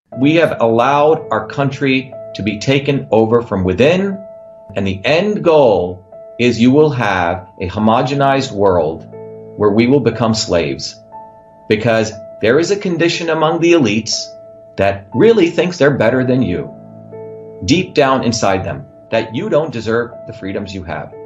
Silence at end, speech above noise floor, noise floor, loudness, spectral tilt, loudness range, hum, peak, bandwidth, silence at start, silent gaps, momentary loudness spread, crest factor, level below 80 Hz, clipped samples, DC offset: 0 s; 25 dB; -38 dBFS; -14 LUFS; -5.5 dB/octave; 3 LU; none; 0 dBFS; 8.2 kHz; 0.1 s; none; 15 LU; 14 dB; -52 dBFS; under 0.1%; under 0.1%